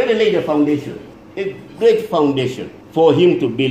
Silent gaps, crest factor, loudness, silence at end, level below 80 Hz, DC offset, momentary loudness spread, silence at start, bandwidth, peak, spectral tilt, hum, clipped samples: none; 16 dB; -16 LUFS; 0 s; -56 dBFS; under 0.1%; 16 LU; 0 s; 14.5 kHz; 0 dBFS; -7 dB/octave; none; under 0.1%